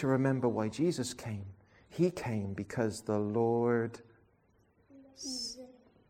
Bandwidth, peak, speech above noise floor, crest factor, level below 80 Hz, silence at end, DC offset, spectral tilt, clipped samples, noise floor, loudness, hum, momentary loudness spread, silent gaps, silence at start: 16 kHz; -16 dBFS; 37 dB; 18 dB; -68 dBFS; 0.4 s; under 0.1%; -6 dB/octave; under 0.1%; -69 dBFS; -34 LUFS; none; 14 LU; none; 0 s